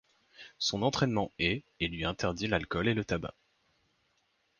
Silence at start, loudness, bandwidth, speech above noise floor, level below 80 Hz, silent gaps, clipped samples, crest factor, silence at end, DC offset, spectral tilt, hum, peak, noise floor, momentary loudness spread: 0.4 s; -32 LUFS; 10 kHz; 43 dB; -52 dBFS; none; under 0.1%; 20 dB; 1.3 s; under 0.1%; -5 dB/octave; none; -14 dBFS; -74 dBFS; 7 LU